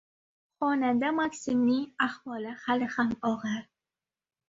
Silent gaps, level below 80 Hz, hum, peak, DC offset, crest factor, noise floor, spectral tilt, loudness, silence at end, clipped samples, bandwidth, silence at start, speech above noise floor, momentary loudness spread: none; -68 dBFS; none; -12 dBFS; under 0.1%; 18 dB; under -90 dBFS; -5 dB/octave; -29 LUFS; 0.85 s; under 0.1%; 7.8 kHz; 0.6 s; over 61 dB; 9 LU